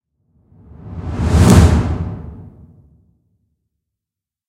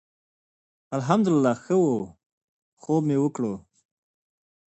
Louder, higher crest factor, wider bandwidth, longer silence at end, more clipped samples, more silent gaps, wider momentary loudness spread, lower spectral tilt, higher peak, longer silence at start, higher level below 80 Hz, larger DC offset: first, -13 LUFS vs -24 LUFS; about the same, 18 dB vs 20 dB; first, 16 kHz vs 8.6 kHz; first, 2.05 s vs 1.15 s; neither; second, none vs 2.26-2.77 s; first, 23 LU vs 15 LU; about the same, -6.5 dB/octave vs -7.5 dB/octave; first, 0 dBFS vs -6 dBFS; about the same, 0.85 s vs 0.9 s; first, -24 dBFS vs -66 dBFS; neither